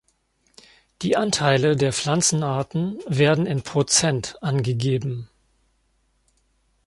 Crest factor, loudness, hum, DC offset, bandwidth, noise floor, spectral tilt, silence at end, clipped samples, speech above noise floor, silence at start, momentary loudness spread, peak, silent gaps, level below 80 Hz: 20 dB; -21 LUFS; none; under 0.1%; 11.5 kHz; -66 dBFS; -4.5 dB/octave; 1.6 s; under 0.1%; 45 dB; 1 s; 8 LU; -4 dBFS; none; -56 dBFS